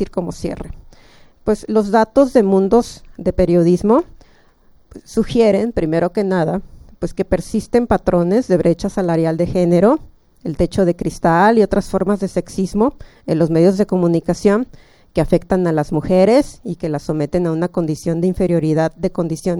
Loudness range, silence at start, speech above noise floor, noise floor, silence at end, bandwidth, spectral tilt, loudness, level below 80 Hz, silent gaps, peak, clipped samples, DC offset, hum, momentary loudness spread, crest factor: 2 LU; 0 s; 34 dB; -50 dBFS; 0 s; 12.5 kHz; -7.5 dB/octave; -16 LUFS; -36 dBFS; none; 0 dBFS; under 0.1%; under 0.1%; none; 11 LU; 16 dB